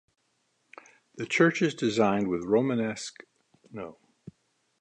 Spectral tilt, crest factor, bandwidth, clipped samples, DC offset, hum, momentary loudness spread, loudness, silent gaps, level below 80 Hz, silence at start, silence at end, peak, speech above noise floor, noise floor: -5.5 dB/octave; 22 dB; 10.5 kHz; under 0.1%; under 0.1%; none; 18 LU; -26 LUFS; none; -68 dBFS; 1.15 s; 0.9 s; -8 dBFS; 47 dB; -74 dBFS